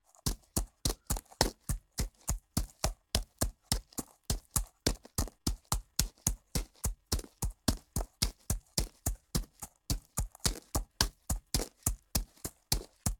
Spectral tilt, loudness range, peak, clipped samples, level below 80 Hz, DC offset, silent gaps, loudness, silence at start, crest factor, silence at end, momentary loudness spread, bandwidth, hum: -3 dB/octave; 1 LU; -4 dBFS; under 0.1%; -40 dBFS; under 0.1%; none; -36 LUFS; 0.25 s; 32 dB; 0.05 s; 7 LU; 18 kHz; none